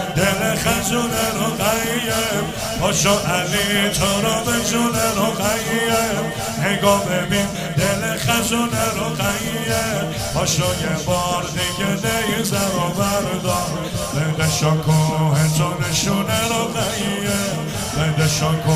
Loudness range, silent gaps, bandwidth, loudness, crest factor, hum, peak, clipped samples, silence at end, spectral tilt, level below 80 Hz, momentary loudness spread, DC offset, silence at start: 2 LU; none; 16 kHz; -19 LUFS; 18 dB; none; -2 dBFS; under 0.1%; 0 s; -4 dB/octave; -38 dBFS; 5 LU; under 0.1%; 0 s